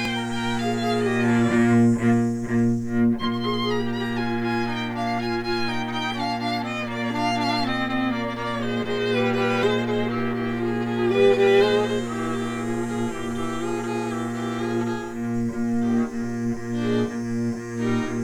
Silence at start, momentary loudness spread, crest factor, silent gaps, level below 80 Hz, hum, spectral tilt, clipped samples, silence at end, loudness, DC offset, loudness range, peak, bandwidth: 0 s; 9 LU; 16 dB; none; -48 dBFS; 60 Hz at -55 dBFS; -6 dB/octave; under 0.1%; 0 s; -24 LUFS; under 0.1%; 5 LU; -6 dBFS; 12.5 kHz